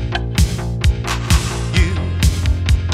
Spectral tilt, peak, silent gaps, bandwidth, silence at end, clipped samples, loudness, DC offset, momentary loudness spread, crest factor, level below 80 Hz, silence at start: -5 dB/octave; 0 dBFS; none; 15.5 kHz; 0 s; under 0.1%; -18 LUFS; under 0.1%; 2 LU; 16 dB; -18 dBFS; 0 s